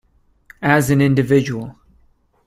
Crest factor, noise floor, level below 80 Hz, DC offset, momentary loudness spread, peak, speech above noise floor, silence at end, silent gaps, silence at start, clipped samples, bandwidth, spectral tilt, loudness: 18 dB; -56 dBFS; -48 dBFS; under 0.1%; 13 LU; 0 dBFS; 41 dB; 0.75 s; none; 0.6 s; under 0.1%; 15 kHz; -6.5 dB/octave; -16 LUFS